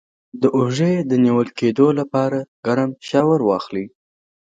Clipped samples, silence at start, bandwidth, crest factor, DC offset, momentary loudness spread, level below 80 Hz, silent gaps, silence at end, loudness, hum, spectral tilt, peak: under 0.1%; 0.35 s; 7.8 kHz; 18 dB; under 0.1%; 7 LU; -62 dBFS; 2.48-2.63 s; 0.55 s; -18 LUFS; none; -7.5 dB/octave; -2 dBFS